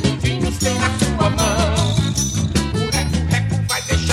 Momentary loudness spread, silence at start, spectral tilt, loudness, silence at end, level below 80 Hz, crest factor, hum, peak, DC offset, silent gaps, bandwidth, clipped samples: 2 LU; 0 s; -4.5 dB/octave; -18 LUFS; 0 s; -28 dBFS; 16 dB; none; -2 dBFS; under 0.1%; none; 16.5 kHz; under 0.1%